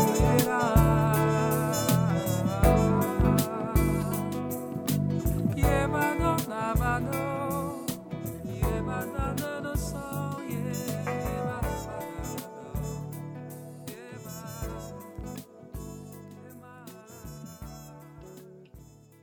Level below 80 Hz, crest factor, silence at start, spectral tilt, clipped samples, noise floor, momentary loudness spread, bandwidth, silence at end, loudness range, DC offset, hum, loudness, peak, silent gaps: -38 dBFS; 22 dB; 0 s; -6 dB/octave; under 0.1%; -51 dBFS; 21 LU; over 20 kHz; 0.35 s; 17 LU; under 0.1%; none; -28 LUFS; -8 dBFS; none